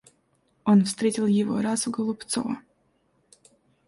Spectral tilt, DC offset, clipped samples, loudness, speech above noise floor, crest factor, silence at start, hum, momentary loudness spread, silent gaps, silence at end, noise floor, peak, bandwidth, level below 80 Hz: -5.5 dB/octave; under 0.1%; under 0.1%; -25 LUFS; 44 dB; 16 dB; 0.65 s; none; 10 LU; none; 1.25 s; -68 dBFS; -10 dBFS; 11.5 kHz; -66 dBFS